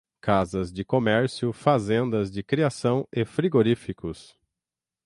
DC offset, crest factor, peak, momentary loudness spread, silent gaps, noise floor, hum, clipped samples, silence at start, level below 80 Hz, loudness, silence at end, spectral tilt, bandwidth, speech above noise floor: under 0.1%; 20 dB; -6 dBFS; 8 LU; none; -90 dBFS; none; under 0.1%; 0.25 s; -52 dBFS; -25 LUFS; 0.85 s; -7 dB/octave; 11.5 kHz; 65 dB